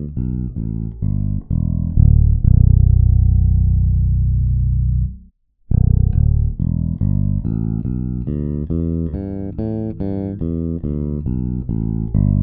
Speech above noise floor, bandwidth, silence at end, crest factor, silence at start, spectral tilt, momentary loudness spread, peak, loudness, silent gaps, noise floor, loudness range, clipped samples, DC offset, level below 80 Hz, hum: 31 dB; 1.6 kHz; 0 s; 16 dB; 0 s; -15 dB/octave; 10 LU; 0 dBFS; -18 LUFS; none; -48 dBFS; 8 LU; under 0.1%; under 0.1%; -20 dBFS; none